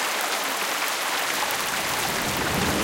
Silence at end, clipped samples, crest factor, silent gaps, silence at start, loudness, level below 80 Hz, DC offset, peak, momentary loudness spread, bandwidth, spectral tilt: 0 s; under 0.1%; 20 dB; none; 0 s; -24 LUFS; -48 dBFS; under 0.1%; -6 dBFS; 1 LU; 17 kHz; -2 dB/octave